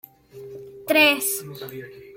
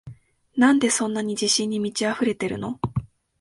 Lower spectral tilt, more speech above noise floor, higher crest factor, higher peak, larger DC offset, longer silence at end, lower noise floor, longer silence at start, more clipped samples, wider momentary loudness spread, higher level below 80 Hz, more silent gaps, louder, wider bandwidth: second, -2 dB/octave vs -3.5 dB/octave; about the same, 20 dB vs 23 dB; about the same, 20 dB vs 20 dB; about the same, -6 dBFS vs -4 dBFS; neither; second, 0 s vs 0.35 s; about the same, -42 dBFS vs -45 dBFS; first, 0.35 s vs 0.05 s; neither; first, 24 LU vs 11 LU; second, -68 dBFS vs -52 dBFS; neither; first, -19 LUFS vs -23 LUFS; first, 16.5 kHz vs 11.5 kHz